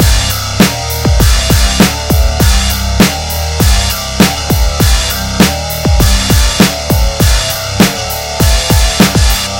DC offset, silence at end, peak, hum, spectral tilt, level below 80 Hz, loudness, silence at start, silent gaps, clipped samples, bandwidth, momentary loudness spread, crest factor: 0.4%; 0 s; 0 dBFS; none; -4 dB/octave; -14 dBFS; -10 LUFS; 0 s; none; 1%; 17.5 kHz; 5 LU; 10 dB